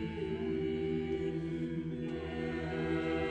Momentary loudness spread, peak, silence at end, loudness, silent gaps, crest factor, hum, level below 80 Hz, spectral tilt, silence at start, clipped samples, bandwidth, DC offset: 4 LU; -22 dBFS; 0 s; -36 LUFS; none; 12 dB; none; -52 dBFS; -8 dB/octave; 0 s; under 0.1%; 9 kHz; under 0.1%